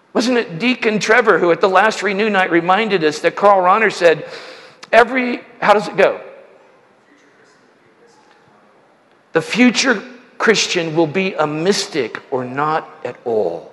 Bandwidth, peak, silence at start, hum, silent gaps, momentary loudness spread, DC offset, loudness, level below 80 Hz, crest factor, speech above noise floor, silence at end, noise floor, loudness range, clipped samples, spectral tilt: 12 kHz; 0 dBFS; 0.15 s; none; none; 10 LU; under 0.1%; -15 LUFS; -62 dBFS; 16 dB; 37 dB; 0.05 s; -53 dBFS; 7 LU; under 0.1%; -4 dB/octave